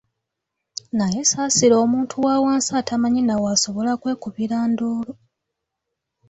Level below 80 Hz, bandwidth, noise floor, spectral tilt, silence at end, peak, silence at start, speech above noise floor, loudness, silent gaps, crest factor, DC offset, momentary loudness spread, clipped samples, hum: -58 dBFS; 8.4 kHz; -81 dBFS; -3.5 dB/octave; 1.15 s; -4 dBFS; 0.95 s; 61 dB; -20 LUFS; none; 16 dB; under 0.1%; 11 LU; under 0.1%; none